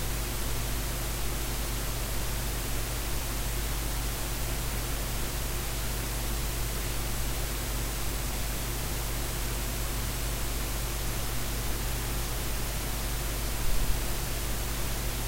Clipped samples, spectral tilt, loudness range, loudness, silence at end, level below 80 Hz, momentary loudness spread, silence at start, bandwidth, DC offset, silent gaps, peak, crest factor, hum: under 0.1%; -3.5 dB/octave; 0 LU; -32 LUFS; 0 s; -34 dBFS; 0 LU; 0 s; 16 kHz; under 0.1%; none; -14 dBFS; 16 dB; none